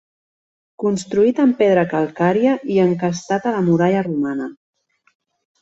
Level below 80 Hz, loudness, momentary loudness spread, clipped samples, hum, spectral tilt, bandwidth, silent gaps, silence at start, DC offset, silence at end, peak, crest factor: -60 dBFS; -18 LUFS; 7 LU; under 0.1%; none; -7 dB/octave; 8.2 kHz; none; 0.8 s; under 0.1%; 1.1 s; -2 dBFS; 16 dB